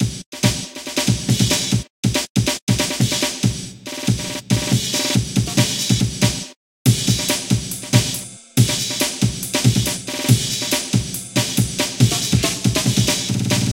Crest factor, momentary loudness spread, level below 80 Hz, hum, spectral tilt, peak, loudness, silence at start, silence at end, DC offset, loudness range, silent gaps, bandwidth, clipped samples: 20 dB; 5 LU; -38 dBFS; none; -4 dB/octave; 0 dBFS; -19 LUFS; 0 s; 0 s; under 0.1%; 1 LU; 0.26-0.32 s, 1.90-2.03 s, 2.30-2.35 s, 2.62-2.67 s, 6.56-6.85 s; 17 kHz; under 0.1%